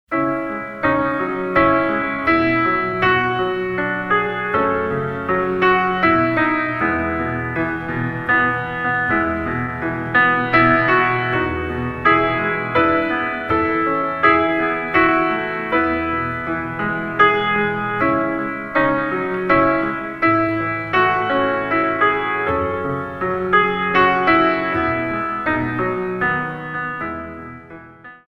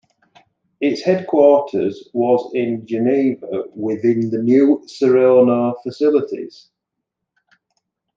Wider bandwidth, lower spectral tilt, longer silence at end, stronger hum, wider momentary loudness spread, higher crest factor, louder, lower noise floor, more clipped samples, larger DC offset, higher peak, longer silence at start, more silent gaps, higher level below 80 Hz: second, 6 kHz vs 7.6 kHz; about the same, -7.5 dB/octave vs -7.5 dB/octave; second, 0.15 s vs 1.65 s; neither; second, 8 LU vs 11 LU; about the same, 18 dB vs 16 dB; about the same, -18 LUFS vs -17 LUFS; second, -40 dBFS vs -80 dBFS; neither; neither; about the same, 0 dBFS vs -2 dBFS; second, 0.1 s vs 0.8 s; neither; first, -44 dBFS vs -70 dBFS